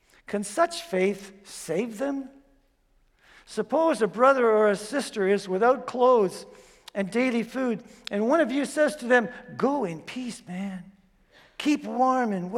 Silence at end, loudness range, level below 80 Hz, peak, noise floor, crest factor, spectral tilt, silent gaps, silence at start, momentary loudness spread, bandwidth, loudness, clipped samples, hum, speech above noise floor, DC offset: 0 s; 7 LU; -66 dBFS; -6 dBFS; -65 dBFS; 20 dB; -5 dB/octave; none; 0.3 s; 15 LU; 14.5 kHz; -25 LUFS; under 0.1%; none; 40 dB; under 0.1%